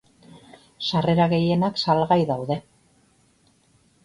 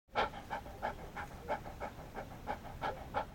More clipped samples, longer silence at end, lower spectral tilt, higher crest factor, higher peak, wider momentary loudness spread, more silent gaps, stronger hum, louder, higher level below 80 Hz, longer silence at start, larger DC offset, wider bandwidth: neither; first, 1.45 s vs 0 s; first, -7 dB/octave vs -5 dB/octave; about the same, 20 dB vs 22 dB; first, -6 dBFS vs -20 dBFS; about the same, 10 LU vs 8 LU; neither; neither; first, -22 LUFS vs -43 LUFS; about the same, -56 dBFS vs -54 dBFS; first, 0.35 s vs 0.1 s; neither; second, 10.5 kHz vs 17 kHz